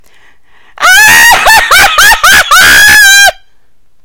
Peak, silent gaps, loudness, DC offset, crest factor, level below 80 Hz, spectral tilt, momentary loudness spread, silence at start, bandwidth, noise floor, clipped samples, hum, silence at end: 0 dBFS; none; -1 LUFS; 3%; 4 dB; -28 dBFS; 1 dB/octave; 4 LU; 0.8 s; over 20 kHz; -51 dBFS; 10%; none; 0.7 s